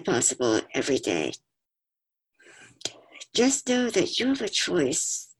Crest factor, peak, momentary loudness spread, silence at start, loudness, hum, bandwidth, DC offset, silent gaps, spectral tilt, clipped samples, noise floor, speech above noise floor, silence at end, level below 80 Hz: 20 dB; -8 dBFS; 13 LU; 0 s; -25 LUFS; none; 12.5 kHz; under 0.1%; none; -2.5 dB/octave; under 0.1%; -88 dBFS; 63 dB; 0.15 s; -64 dBFS